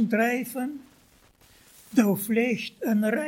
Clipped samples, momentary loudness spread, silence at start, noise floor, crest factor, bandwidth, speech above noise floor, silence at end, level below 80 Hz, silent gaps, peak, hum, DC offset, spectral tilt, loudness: under 0.1%; 10 LU; 0 s; -59 dBFS; 18 dB; 17 kHz; 34 dB; 0 s; -68 dBFS; none; -8 dBFS; none; under 0.1%; -5.5 dB/octave; -26 LUFS